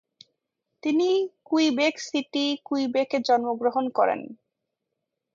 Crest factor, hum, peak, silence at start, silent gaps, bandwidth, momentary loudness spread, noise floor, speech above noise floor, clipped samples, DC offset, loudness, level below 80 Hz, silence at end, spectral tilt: 16 dB; none; -10 dBFS; 0.85 s; none; 7.6 kHz; 6 LU; -82 dBFS; 58 dB; under 0.1%; under 0.1%; -25 LUFS; -78 dBFS; 1 s; -3.5 dB/octave